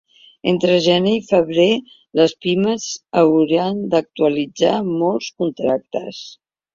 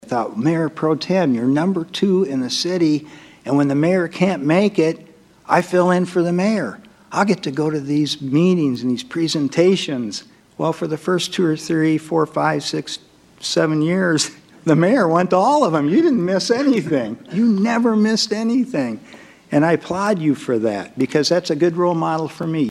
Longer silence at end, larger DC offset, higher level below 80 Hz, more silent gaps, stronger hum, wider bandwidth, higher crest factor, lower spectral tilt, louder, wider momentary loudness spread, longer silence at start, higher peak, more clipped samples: first, 0.4 s vs 0 s; neither; about the same, -58 dBFS vs -62 dBFS; neither; neither; second, 7.6 kHz vs 13 kHz; about the same, 16 dB vs 18 dB; about the same, -5.5 dB/octave vs -5.5 dB/octave; about the same, -18 LUFS vs -18 LUFS; about the same, 10 LU vs 8 LU; first, 0.45 s vs 0.05 s; about the same, -2 dBFS vs 0 dBFS; neither